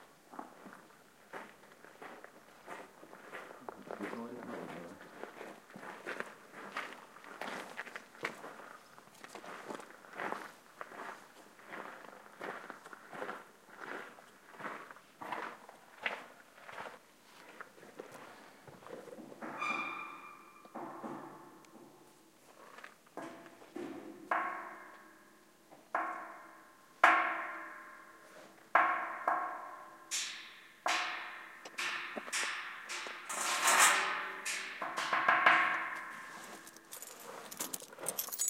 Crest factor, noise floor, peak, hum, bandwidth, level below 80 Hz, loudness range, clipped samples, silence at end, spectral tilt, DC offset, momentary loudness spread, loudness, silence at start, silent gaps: 30 dB; -63 dBFS; -10 dBFS; none; 16 kHz; -88 dBFS; 16 LU; under 0.1%; 0 s; -0.5 dB/octave; under 0.1%; 24 LU; -36 LUFS; 0 s; none